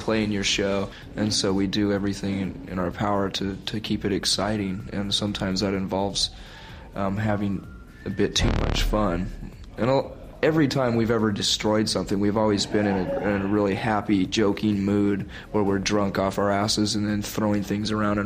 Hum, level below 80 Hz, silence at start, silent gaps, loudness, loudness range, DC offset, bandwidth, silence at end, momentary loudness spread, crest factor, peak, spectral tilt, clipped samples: none; -38 dBFS; 0 s; none; -24 LUFS; 4 LU; under 0.1%; 15.5 kHz; 0 s; 8 LU; 18 dB; -8 dBFS; -5 dB/octave; under 0.1%